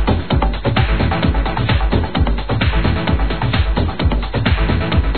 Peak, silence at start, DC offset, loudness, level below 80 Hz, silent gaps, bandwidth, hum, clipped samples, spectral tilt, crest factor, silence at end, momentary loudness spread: -2 dBFS; 0 s; 3%; -17 LUFS; -20 dBFS; none; 4.6 kHz; none; under 0.1%; -10 dB/octave; 14 dB; 0 s; 2 LU